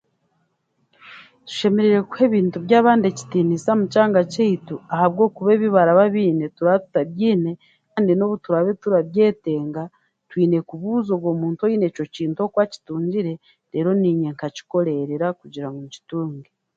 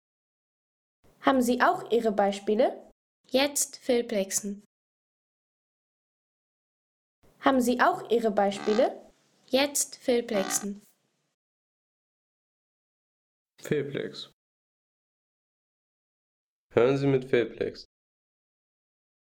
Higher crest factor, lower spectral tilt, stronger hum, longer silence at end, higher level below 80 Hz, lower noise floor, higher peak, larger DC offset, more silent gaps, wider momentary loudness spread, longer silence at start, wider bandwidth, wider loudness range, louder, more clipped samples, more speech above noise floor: about the same, 18 dB vs 22 dB; first, -7.5 dB/octave vs -4 dB/octave; neither; second, 0.35 s vs 1.5 s; about the same, -66 dBFS vs -66 dBFS; first, -69 dBFS vs -57 dBFS; first, -2 dBFS vs -8 dBFS; neither; second, none vs 2.92-3.24 s, 4.66-7.22 s, 11.34-13.46 s, 14.33-16.70 s; about the same, 14 LU vs 15 LU; second, 1.05 s vs 1.2 s; second, 7.8 kHz vs 18.5 kHz; second, 5 LU vs 12 LU; first, -20 LUFS vs -27 LUFS; neither; first, 50 dB vs 31 dB